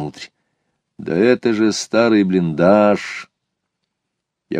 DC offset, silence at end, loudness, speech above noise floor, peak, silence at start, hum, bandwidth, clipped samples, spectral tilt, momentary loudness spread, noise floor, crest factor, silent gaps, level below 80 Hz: under 0.1%; 0 s; -15 LUFS; 62 dB; -2 dBFS; 0 s; none; 10.5 kHz; under 0.1%; -6 dB/octave; 17 LU; -78 dBFS; 16 dB; none; -58 dBFS